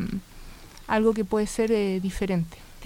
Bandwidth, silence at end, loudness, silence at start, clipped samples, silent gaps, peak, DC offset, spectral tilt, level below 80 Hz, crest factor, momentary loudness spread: 16.5 kHz; 0 s; -26 LUFS; 0 s; under 0.1%; none; -10 dBFS; under 0.1%; -6 dB/octave; -44 dBFS; 16 dB; 13 LU